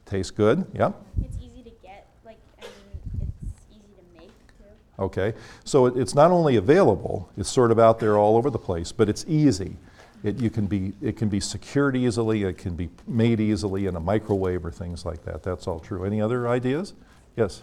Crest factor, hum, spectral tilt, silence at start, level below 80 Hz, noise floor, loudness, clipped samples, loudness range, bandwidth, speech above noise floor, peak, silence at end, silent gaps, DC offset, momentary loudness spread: 20 dB; none; -6.5 dB/octave; 0.1 s; -44 dBFS; -52 dBFS; -23 LUFS; under 0.1%; 14 LU; 13 kHz; 29 dB; -4 dBFS; 0 s; none; under 0.1%; 16 LU